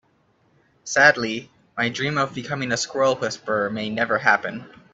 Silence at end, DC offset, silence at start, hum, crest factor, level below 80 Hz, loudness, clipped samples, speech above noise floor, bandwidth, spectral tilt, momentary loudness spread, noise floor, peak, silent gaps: 0.25 s; under 0.1%; 0.85 s; none; 22 dB; -64 dBFS; -21 LUFS; under 0.1%; 41 dB; 8.2 kHz; -3.5 dB/octave; 16 LU; -63 dBFS; -2 dBFS; none